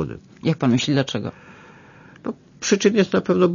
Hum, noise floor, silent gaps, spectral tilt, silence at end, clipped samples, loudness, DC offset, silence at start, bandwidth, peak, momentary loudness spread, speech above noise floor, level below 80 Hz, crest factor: none; -46 dBFS; none; -5.5 dB/octave; 0 s; under 0.1%; -20 LUFS; under 0.1%; 0 s; 7.4 kHz; -4 dBFS; 15 LU; 27 dB; -56 dBFS; 18 dB